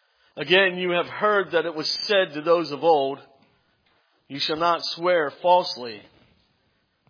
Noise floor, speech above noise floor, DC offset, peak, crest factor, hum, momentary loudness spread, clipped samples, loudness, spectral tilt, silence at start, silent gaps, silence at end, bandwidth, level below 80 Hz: -69 dBFS; 46 dB; under 0.1%; -4 dBFS; 20 dB; none; 15 LU; under 0.1%; -22 LUFS; -4.5 dB/octave; 0.35 s; none; 1.1 s; 5.4 kHz; -74 dBFS